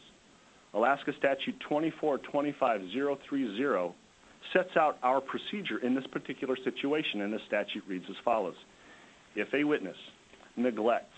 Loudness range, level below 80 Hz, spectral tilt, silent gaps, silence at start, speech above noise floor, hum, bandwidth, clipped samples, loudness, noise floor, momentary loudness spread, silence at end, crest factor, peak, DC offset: 3 LU; -76 dBFS; -5.5 dB/octave; none; 0.75 s; 29 dB; none; 8.6 kHz; under 0.1%; -32 LUFS; -60 dBFS; 10 LU; 0.1 s; 22 dB; -10 dBFS; under 0.1%